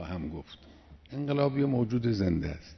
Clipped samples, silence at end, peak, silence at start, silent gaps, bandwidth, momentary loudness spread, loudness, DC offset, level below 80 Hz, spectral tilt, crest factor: under 0.1%; 0 s; -14 dBFS; 0 s; none; 6.4 kHz; 16 LU; -30 LUFS; under 0.1%; -48 dBFS; -8.5 dB/octave; 18 dB